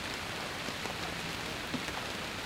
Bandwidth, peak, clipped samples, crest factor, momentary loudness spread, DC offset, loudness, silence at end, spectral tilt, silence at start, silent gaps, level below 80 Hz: 16.5 kHz; -20 dBFS; under 0.1%; 18 dB; 1 LU; under 0.1%; -37 LUFS; 0 s; -3 dB/octave; 0 s; none; -56 dBFS